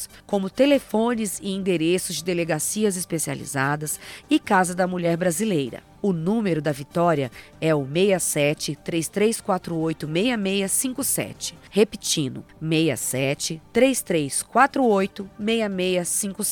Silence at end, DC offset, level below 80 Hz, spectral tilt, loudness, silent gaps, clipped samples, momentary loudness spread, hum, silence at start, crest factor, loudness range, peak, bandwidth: 0 s; under 0.1%; -56 dBFS; -4 dB/octave; -23 LUFS; none; under 0.1%; 7 LU; none; 0 s; 20 dB; 2 LU; -4 dBFS; 18 kHz